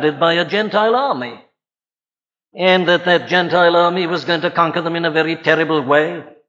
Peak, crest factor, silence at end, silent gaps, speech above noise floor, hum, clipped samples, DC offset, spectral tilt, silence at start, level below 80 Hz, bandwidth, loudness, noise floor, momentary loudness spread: -2 dBFS; 16 dB; 0.2 s; none; over 75 dB; none; under 0.1%; under 0.1%; -6 dB/octave; 0 s; -66 dBFS; 7.6 kHz; -15 LUFS; under -90 dBFS; 6 LU